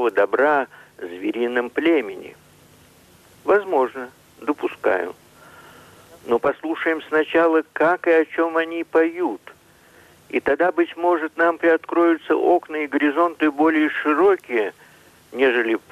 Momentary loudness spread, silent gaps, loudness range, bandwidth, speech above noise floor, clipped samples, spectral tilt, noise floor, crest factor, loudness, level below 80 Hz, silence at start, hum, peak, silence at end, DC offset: 12 LU; none; 6 LU; 13.5 kHz; 32 dB; under 0.1%; -5.5 dB/octave; -51 dBFS; 12 dB; -20 LUFS; -64 dBFS; 0 s; none; -8 dBFS; 0.15 s; under 0.1%